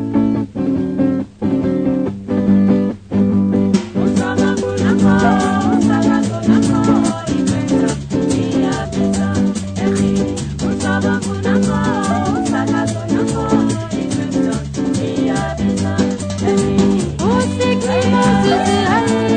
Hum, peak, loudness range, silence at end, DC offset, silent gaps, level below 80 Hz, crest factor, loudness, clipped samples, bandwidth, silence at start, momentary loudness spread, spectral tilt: none; 0 dBFS; 3 LU; 0 s; under 0.1%; none; -38 dBFS; 14 dB; -16 LUFS; under 0.1%; 9.6 kHz; 0 s; 6 LU; -6 dB/octave